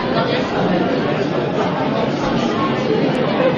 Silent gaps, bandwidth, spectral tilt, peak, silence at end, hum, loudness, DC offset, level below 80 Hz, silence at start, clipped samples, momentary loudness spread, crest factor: none; 9.2 kHz; -6.5 dB/octave; -4 dBFS; 0 s; none; -18 LUFS; under 0.1%; -44 dBFS; 0 s; under 0.1%; 2 LU; 14 dB